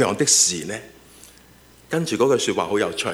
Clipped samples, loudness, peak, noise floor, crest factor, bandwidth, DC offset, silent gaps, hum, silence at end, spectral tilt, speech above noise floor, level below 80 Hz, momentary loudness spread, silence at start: under 0.1%; -19 LUFS; -4 dBFS; -50 dBFS; 18 dB; over 20 kHz; under 0.1%; none; none; 0 s; -2.5 dB/octave; 29 dB; -58 dBFS; 14 LU; 0 s